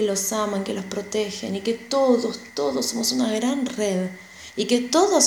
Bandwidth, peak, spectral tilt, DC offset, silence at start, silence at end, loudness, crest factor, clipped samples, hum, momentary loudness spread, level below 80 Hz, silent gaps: 19.5 kHz; -4 dBFS; -3 dB/octave; under 0.1%; 0 s; 0 s; -23 LUFS; 18 dB; under 0.1%; none; 9 LU; -62 dBFS; none